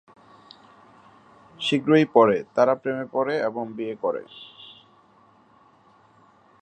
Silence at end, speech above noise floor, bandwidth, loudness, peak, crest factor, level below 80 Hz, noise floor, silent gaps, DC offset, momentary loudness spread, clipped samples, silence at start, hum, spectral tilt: 1.9 s; 35 dB; 9.2 kHz; -23 LUFS; -2 dBFS; 24 dB; -72 dBFS; -57 dBFS; none; under 0.1%; 24 LU; under 0.1%; 1.6 s; none; -6.5 dB/octave